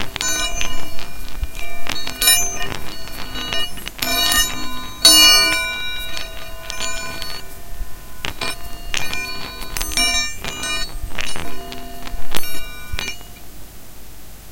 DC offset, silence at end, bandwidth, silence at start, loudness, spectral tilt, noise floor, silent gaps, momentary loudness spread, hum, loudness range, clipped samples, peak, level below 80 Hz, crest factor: under 0.1%; 0 s; 17 kHz; 0 s; -18 LUFS; -0.5 dB/octave; -37 dBFS; none; 20 LU; none; 13 LU; under 0.1%; 0 dBFS; -32 dBFS; 18 dB